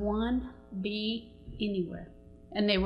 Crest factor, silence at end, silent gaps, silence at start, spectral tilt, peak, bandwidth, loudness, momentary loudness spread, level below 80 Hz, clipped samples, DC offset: 18 dB; 0 s; none; 0 s; -8 dB/octave; -14 dBFS; 5.4 kHz; -34 LUFS; 14 LU; -48 dBFS; under 0.1%; under 0.1%